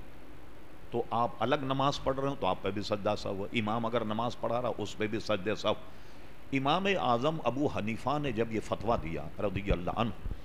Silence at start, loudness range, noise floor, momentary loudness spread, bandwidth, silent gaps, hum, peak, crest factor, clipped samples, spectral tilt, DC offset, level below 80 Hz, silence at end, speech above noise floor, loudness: 0 s; 2 LU; -52 dBFS; 9 LU; 15.5 kHz; none; none; -14 dBFS; 18 dB; under 0.1%; -6 dB/octave; 1%; -48 dBFS; 0 s; 20 dB; -32 LUFS